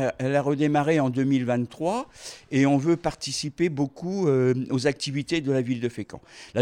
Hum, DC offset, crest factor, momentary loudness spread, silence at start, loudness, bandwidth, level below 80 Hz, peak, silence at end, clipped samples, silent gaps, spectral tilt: none; under 0.1%; 16 dB; 10 LU; 0 s; -25 LUFS; 11.5 kHz; -58 dBFS; -8 dBFS; 0 s; under 0.1%; none; -6 dB/octave